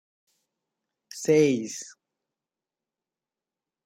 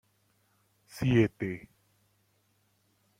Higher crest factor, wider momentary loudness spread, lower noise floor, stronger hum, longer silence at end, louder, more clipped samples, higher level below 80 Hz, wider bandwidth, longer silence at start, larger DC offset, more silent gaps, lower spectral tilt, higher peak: about the same, 22 dB vs 22 dB; first, 22 LU vs 18 LU; first, under -90 dBFS vs -72 dBFS; neither; first, 1.95 s vs 1.6 s; first, -24 LUFS vs -29 LUFS; neither; second, -76 dBFS vs -58 dBFS; about the same, 16 kHz vs 16 kHz; first, 1.15 s vs 0.95 s; neither; neither; second, -5 dB/octave vs -7.5 dB/octave; first, -8 dBFS vs -12 dBFS